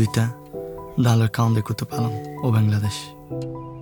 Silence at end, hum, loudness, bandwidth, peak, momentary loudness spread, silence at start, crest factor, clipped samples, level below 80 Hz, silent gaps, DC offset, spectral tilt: 0 s; none; -23 LUFS; 20 kHz; -4 dBFS; 14 LU; 0 s; 18 dB; under 0.1%; -52 dBFS; none; under 0.1%; -6.5 dB/octave